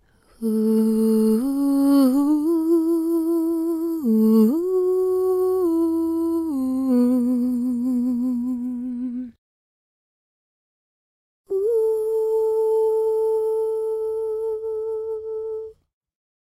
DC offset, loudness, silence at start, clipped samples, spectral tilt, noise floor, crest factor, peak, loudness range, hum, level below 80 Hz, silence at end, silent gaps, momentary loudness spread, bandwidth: under 0.1%; -21 LUFS; 0.4 s; under 0.1%; -8 dB/octave; under -90 dBFS; 14 dB; -8 dBFS; 8 LU; none; -60 dBFS; 0.75 s; 9.38-11.44 s; 11 LU; 14.5 kHz